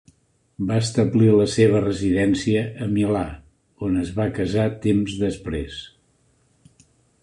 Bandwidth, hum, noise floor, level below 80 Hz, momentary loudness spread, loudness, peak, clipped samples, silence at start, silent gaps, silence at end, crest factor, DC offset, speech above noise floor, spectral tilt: 11 kHz; none; -62 dBFS; -44 dBFS; 13 LU; -21 LUFS; -4 dBFS; under 0.1%; 0.6 s; none; 1.35 s; 18 dB; under 0.1%; 42 dB; -6.5 dB/octave